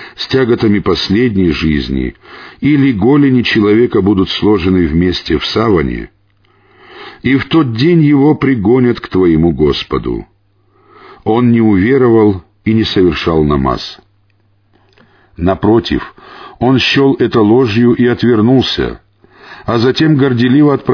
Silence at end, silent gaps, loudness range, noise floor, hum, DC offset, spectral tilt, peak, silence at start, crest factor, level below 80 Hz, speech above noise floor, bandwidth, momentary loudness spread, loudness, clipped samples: 0 s; none; 4 LU; -54 dBFS; none; under 0.1%; -7.5 dB/octave; 0 dBFS; 0 s; 10 dB; -32 dBFS; 44 dB; 5.4 kHz; 10 LU; -11 LUFS; under 0.1%